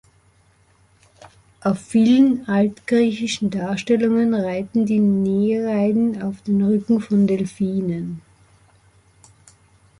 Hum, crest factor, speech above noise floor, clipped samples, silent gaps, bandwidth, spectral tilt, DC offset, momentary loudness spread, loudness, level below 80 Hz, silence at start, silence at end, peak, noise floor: none; 14 dB; 39 dB; under 0.1%; none; 11 kHz; -7 dB/octave; under 0.1%; 8 LU; -19 LUFS; -58 dBFS; 1.65 s; 1.8 s; -6 dBFS; -57 dBFS